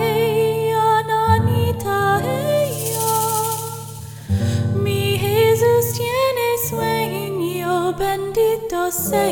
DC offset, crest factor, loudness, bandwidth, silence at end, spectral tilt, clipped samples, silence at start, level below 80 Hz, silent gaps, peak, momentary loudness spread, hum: under 0.1%; 16 dB; -19 LUFS; 19.5 kHz; 0 s; -5 dB/octave; under 0.1%; 0 s; -44 dBFS; none; -2 dBFS; 7 LU; none